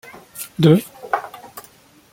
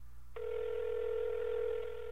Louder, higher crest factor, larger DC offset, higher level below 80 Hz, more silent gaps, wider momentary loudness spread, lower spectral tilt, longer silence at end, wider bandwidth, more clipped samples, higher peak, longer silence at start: first, -18 LUFS vs -38 LUFS; first, 20 dB vs 10 dB; second, under 0.1% vs 0.6%; about the same, -60 dBFS vs -56 dBFS; neither; first, 23 LU vs 6 LU; about the same, -6.5 dB/octave vs -5.5 dB/octave; first, 0.55 s vs 0 s; first, 17 kHz vs 6.6 kHz; neither; first, -2 dBFS vs -28 dBFS; first, 0.35 s vs 0 s